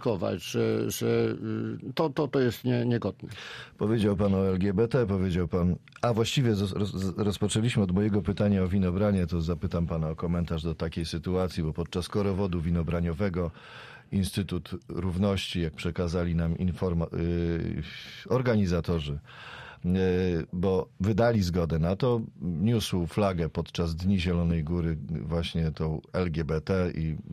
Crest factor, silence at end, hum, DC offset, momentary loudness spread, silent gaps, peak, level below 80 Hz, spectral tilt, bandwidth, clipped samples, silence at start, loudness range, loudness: 16 dB; 0 s; none; under 0.1%; 8 LU; none; -12 dBFS; -44 dBFS; -7 dB/octave; 14.5 kHz; under 0.1%; 0 s; 3 LU; -28 LUFS